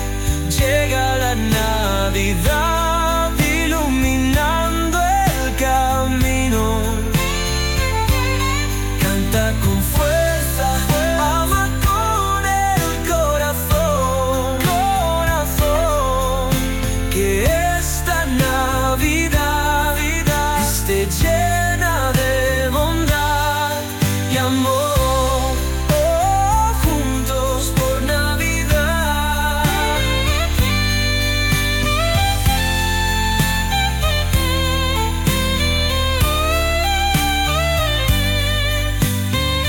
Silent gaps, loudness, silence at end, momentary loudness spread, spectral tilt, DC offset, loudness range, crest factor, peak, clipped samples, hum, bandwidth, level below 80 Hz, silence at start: none; -17 LUFS; 0 s; 2 LU; -4 dB/octave; under 0.1%; 1 LU; 12 dB; -4 dBFS; under 0.1%; none; 18 kHz; -22 dBFS; 0 s